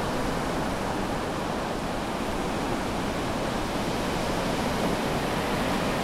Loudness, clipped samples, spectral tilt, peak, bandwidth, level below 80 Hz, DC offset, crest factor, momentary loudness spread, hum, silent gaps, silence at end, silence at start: -28 LUFS; under 0.1%; -5 dB/octave; -14 dBFS; 16 kHz; -40 dBFS; under 0.1%; 14 dB; 3 LU; none; none; 0 s; 0 s